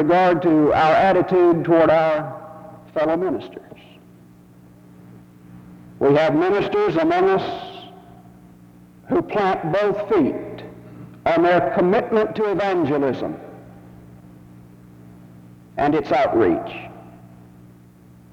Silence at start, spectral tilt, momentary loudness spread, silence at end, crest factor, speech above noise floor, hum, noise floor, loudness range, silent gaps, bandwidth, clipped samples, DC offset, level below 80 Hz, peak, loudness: 0 s; -7.5 dB/octave; 21 LU; 1.05 s; 16 dB; 29 dB; 60 Hz at -50 dBFS; -47 dBFS; 9 LU; none; 7.4 kHz; under 0.1%; under 0.1%; -52 dBFS; -4 dBFS; -19 LUFS